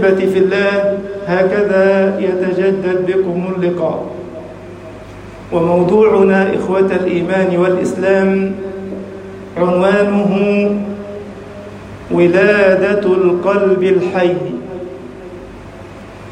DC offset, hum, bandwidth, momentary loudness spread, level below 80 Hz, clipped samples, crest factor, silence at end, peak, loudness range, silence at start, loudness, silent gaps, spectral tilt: under 0.1%; none; 9.6 kHz; 21 LU; -46 dBFS; under 0.1%; 14 dB; 0 s; 0 dBFS; 4 LU; 0 s; -13 LUFS; none; -7.5 dB/octave